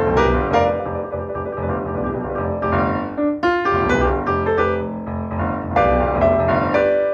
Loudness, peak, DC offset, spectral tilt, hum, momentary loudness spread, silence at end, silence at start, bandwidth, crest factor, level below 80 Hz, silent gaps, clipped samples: -19 LUFS; -2 dBFS; under 0.1%; -7.5 dB/octave; none; 9 LU; 0 s; 0 s; 7.4 kHz; 16 dB; -32 dBFS; none; under 0.1%